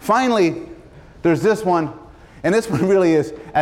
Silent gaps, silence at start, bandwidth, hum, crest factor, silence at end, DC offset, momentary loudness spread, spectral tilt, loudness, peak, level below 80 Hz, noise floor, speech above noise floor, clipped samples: none; 0 s; 15 kHz; none; 12 dB; 0 s; under 0.1%; 10 LU; -6 dB/octave; -18 LUFS; -6 dBFS; -50 dBFS; -42 dBFS; 25 dB; under 0.1%